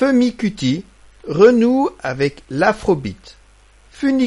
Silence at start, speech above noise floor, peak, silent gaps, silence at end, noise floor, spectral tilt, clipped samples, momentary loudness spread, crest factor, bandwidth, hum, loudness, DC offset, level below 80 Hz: 0 s; 33 dB; 0 dBFS; none; 0 s; -49 dBFS; -6.5 dB/octave; under 0.1%; 13 LU; 16 dB; 11 kHz; none; -17 LUFS; under 0.1%; -46 dBFS